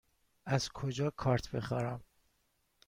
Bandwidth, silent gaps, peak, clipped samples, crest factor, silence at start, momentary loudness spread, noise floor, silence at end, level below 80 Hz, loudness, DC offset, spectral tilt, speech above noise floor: 15.5 kHz; none; -18 dBFS; under 0.1%; 20 dB; 0.45 s; 9 LU; -77 dBFS; 0.85 s; -58 dBFS; -36 LUFS; under 0.1%; -6 dB/octave; 42 dB